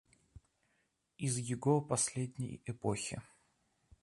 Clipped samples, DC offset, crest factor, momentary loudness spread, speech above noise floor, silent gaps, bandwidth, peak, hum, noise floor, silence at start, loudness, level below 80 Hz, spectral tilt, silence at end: under 0.1%; under 0.1%; 22 dB; 11 LU; 43 dB; none; 11.5 kHz; -18 dBFS; none; -79 dBFS; 0.35 s; -36 LUFS; -66 dBFS; -5 dB/octave; 0.8 s